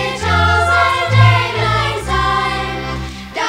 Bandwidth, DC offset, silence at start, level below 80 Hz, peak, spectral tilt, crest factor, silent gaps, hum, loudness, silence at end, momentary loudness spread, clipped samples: 11.5 kHz; under 0.1%; 0 s; -30 dBFS; 0 dBFS; -5 dB/octave; 14 dB; none; none; -14 LUFS; 0 s; 12 LU; under 0.1%